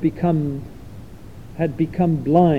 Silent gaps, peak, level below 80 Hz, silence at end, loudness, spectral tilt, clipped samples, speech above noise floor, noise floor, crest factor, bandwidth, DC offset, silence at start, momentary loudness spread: none; -2 dBFS; -44 dBFS; 0 s; -21 LUFS; -10 dB/octave; under 0.1%; 21 dB; -39 dBFS; 18 dB; 5.4 kHz; 0.7%; 0 s; 23 LU